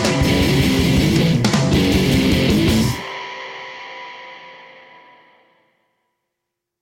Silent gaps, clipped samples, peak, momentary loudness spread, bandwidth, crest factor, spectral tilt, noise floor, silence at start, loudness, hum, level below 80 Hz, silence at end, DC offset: none; under 0.1%; -4 dBFS; 18 LU; 16.5 kHz; 14 dB; -5.5 dB/octave; -80 dBFS; 0 s; -16 LUFS; none; -32 dBFS; 2.2 s; under 0.1%